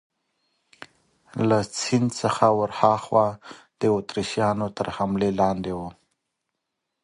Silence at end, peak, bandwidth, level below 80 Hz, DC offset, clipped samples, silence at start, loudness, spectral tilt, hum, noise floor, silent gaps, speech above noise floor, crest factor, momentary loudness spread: 1.1 s; -2 dBFS; 11.5 kHz; -56 dBFS; under 0.1%; under 0.1%; 1.35 s; -23 LUFS; -5.5 dB/octave; none; -81 dBFS; none; 58 dB; 22 dB; 9 LU